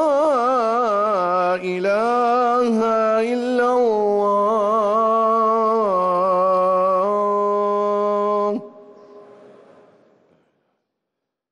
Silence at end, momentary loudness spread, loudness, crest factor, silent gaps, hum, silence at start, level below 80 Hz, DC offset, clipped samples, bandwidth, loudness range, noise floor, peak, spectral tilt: 2.3 s; 3 LU; -18 LUFS; 10 dB; none; none; 0 s; -66 dBFS; under 0.1%; under 0.1%; 11.5 kHz; 7 LU; -81 dBFS; -10 dBFS; -6 dB/octave